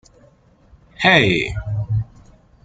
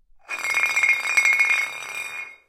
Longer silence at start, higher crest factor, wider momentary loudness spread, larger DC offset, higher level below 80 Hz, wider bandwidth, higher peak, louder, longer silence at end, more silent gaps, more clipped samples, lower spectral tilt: first, 1 s vs 0.3 s; about the same, 20 dB vs 18 dB; about the same, 12 LU vs 13 LU; neither; first, -40 dBFS vs -68 dBFS; second, 9.2 kHz vs 17 kHz; first, 0 dBFS vs -4 dBFS; about the same, -17 LUFS vs -19 LUFS; first, 0.6 s vs 0.15 s; neither; neither; first, -5.5 dB/octave vs 2 dB/octave